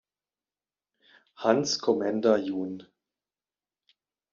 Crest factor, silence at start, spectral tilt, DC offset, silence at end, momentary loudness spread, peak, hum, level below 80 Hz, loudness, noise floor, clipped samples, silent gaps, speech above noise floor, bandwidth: 22 dB; 1.4 s; -4 dB/octave; under 0.1%; 1.5 s; 11 LU; -8 dBFS; 50 Hz at -70 dBFS; -76 dBFS; -27 LUFS; under -90 dBFS; under 0.1%; none; over 64 dB; 7.4 kHz